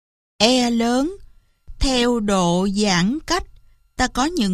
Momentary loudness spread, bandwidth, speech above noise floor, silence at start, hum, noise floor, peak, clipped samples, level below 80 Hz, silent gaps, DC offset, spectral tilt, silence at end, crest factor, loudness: 7 LU; 14.5 kHz; 29 dB; 0.4 s; none; -47 dBFS; -2 dBFS; under 0.1%; -34 dBFS; none; under 0.1%; -4 dB/octave; 0 s; 18 dB; -19 LUFS